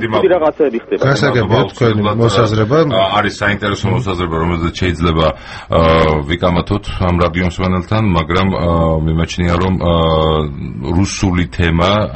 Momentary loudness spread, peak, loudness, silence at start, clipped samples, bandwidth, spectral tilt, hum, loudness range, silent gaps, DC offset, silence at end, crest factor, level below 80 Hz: 5 LU; 0 dBFS; -14 LUFS; 0 s; under 0.1%; 8.6 kHz; -6.5 dB/octave; none; 2 LU; none; under 0.1%; 0 s; 14 dB; -28 dBFS